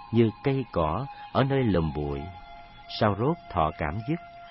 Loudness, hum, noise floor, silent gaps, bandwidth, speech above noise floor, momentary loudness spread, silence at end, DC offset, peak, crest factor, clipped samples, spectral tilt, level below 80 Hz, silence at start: -28 LUFS; none; -46 dBFS; none; 5.8 kHz; 19 dB; 13 LU; 0 s; under 0.1%; -8 dBFS; 18 dB; under 0.1%; -11 dB/octave; -44 dBFS; 0 s